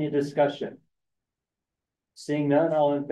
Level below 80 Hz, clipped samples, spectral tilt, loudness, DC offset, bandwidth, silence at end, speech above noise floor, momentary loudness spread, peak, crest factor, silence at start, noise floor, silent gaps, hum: -76 dBFS; under 0.1%; -7 dB/octave; -25 LUFS; under 0.1%; 11.5 kHz; 0 s; 63 dB; 14 LU; -10 dBFS; 16 dB; 0 s; -87 dBFS; none; none